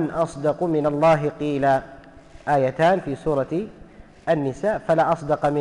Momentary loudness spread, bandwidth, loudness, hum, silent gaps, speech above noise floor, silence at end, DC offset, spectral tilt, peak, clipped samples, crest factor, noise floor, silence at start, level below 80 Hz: 7 LU; 11 kHz; -22 LUFS; none; none; 24 dB; 0 s; under 0.1%; -7 dB/octave; -8 dBFS; under 0.1%; 12 dB; -45 dBFS; 0 s; -48 dBFS